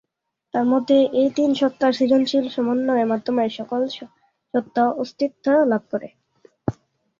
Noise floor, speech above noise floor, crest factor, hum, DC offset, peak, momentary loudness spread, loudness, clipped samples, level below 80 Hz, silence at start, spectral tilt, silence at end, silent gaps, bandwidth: -76 dBFS; 56 dB; 16 dB; none; under 0.1%; -6 dBFS; 13 LU; -21 LUFS; under 0.1%; -60 dBFS; 0.55 s; -6 dB/octave; 0.45 s; none; 7.4 kHz